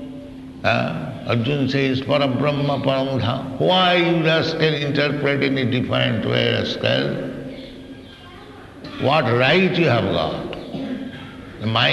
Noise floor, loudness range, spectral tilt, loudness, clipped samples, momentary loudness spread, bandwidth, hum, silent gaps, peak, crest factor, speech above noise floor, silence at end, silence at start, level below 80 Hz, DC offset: -40 dBFS; 4 LU; -6.5 dB/octave; -19 LUFS; under 0.1%; 20 LU; 12 kHz; none; none; -2 dBFS; 18 dB; 21 dB; 0 s; 0 s; -50 dBFS; under 0.1%